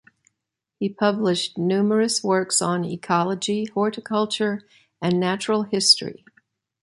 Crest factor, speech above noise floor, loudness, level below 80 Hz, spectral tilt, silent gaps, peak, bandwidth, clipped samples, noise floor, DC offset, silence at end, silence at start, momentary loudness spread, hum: 20 dB; 60 dB; -22 LUFS; -68 dBFS; -4 dB/octave; none; -2 dBFS; 11.5 kHz; under 0.1%; -82 dBFS; under 0.1%; 0.7 s; 0.8 s; 9 LU; none